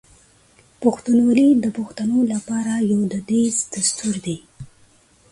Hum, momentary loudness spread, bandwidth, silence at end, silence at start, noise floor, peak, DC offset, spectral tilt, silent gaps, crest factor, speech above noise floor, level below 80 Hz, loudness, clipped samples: none; 10 LU; 11.5 kHz; 0.65 s; 0.8 s; -54 dBFS; -4 dBFS; under 0.1%; -4.5 dB/octave; none; 18 dB; 36 dB; -58 dBFS; -19 LUFS; under 0.1%